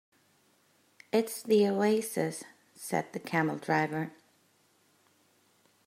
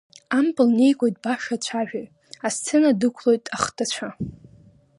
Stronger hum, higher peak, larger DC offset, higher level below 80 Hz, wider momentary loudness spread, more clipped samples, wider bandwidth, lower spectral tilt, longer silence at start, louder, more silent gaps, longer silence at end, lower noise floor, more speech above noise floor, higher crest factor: neither; second, -14 dBFS vs -4 dBFS; neither; second, -82 dBFS vs -58 dBFS; about the same, 14 LU vs 14 LU; neither; first, 16 kHz vs 11.5 kHz; about the same, -5 dB/octave vs -4 dB/octave; first, 1.15 s vs 0.3 s; second, -30 LUFS vs -22 LUFS; neither; first, 1.75 s vs 0.65 s; first, -68 dBFS vs -53 dBFS; first, 39 dB vs 31 dB; about the same, 20 dB vs 20 dB